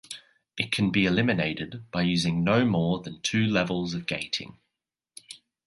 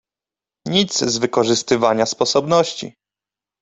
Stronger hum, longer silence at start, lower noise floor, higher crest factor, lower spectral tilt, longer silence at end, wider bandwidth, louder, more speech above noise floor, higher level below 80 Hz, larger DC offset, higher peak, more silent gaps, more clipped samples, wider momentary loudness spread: neither; second, 0.1 s vs 0.65 s; about the same, -86 dBFS vs -89 dBFS; about the same, 20 dB vs 18 dB; first, -5.5 dB/octave vs -3.5 dB/octave; second, 0.3 s vs 0.7 s; first, 11.5 kHz vs 8.4 kHz; second, -26 LUFS vs -17 LUFS; second, 60 dB vs 72 dB; about the same, -54 dBFS vs -58 dBFS; neither; second, -6 dBFS vs -2 dBFS; neither; neither; first, 20 LU vs 11 LU